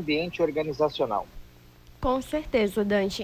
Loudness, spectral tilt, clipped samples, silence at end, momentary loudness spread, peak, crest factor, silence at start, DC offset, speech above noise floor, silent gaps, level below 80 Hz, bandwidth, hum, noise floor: -27 LUFS; -5.5 dB/octave; under 0.1%; 0 s; 6 LU; -12 dBFS; 16 dB; 0 s; under 0.1%; 25 dB; none; -46 dBFS; 16 kHz; 60 Hz at -55 dBFS; -52 dBFS